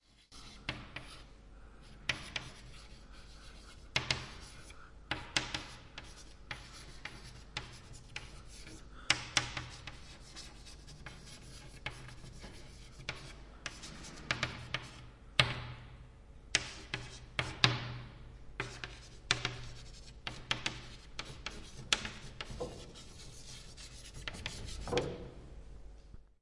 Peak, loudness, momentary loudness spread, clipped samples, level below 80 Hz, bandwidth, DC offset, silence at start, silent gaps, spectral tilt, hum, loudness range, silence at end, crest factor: -2 dBFS; -39 LUFS; 20 LU; under 0.1%; -54 dBFS; 11.5 kHz; under 0.1%; 0.1 s; none; -2.5 dB/octave; none; 11 LU; 0.1 s; 40 dB